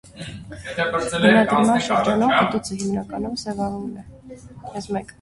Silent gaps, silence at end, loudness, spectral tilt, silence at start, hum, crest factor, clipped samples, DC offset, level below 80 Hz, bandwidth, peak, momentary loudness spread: none; 0.1 s; -20 LUFS; -5 dB/octave; 0.05 s; none; 20 dB; under 0.1%; under 0.1%; -50 dBFS; 11.5 kHz; -2 dBFS; 20 LU